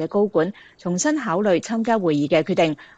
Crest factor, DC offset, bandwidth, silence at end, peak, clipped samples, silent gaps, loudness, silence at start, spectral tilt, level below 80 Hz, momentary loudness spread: 16 dB; under 0.1%; 9.4 kHz; 0.15 s; -4 dBFS; under 0.1%; none; -21 LUFS; 0 s; -5 dB/octave; -62 dBFS; 6 LU